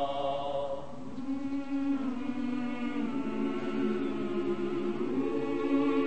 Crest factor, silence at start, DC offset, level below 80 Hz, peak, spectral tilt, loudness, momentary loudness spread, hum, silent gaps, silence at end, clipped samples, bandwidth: 16 dB; 0 s; 1%; -62 dBFS; -16 dBFS; -7 dB/octave; -33 LUFS; 5 LU; none; none; 0 s; under 0.1%; 8.6 kHz